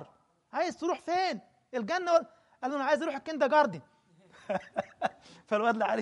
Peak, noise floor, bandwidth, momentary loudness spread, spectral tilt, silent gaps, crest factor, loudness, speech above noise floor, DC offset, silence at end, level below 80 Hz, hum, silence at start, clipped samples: -12 dBFS; -62 dBFS; 11 kHz; 12 LU; -4.5 dB/octave; none; 20 dB; -31 LUFS; 32 dB; under 0.1%; 0 s; -76 dBFS; none; 0 s; under 0.1%